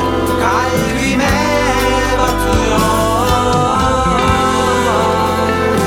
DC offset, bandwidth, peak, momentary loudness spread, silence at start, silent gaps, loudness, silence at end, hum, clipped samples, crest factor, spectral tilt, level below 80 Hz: under 0.1%; 17 kHz; 0 dBFS; 2 LU; 0 s; none; -13 LUFS; 0 s; none; under 0.1%; 12 dB; -4.5 dB/octave; -24 dBFS